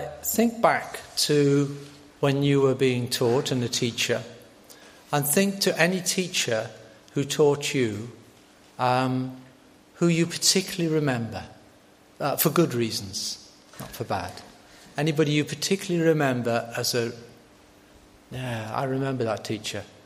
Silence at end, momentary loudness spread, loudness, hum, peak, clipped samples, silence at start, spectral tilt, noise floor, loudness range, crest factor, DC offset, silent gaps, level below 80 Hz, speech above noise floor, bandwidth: 0.2 s; 14 LU; -25 LUFS; none; -4 dBFS; under 0.1%; 0 s; -4.5 dB/octave; -55 dBFS; 5 LU; 22 dB; under 0.1%; none; -62 dBFS; 30 dB; 15.5 kHz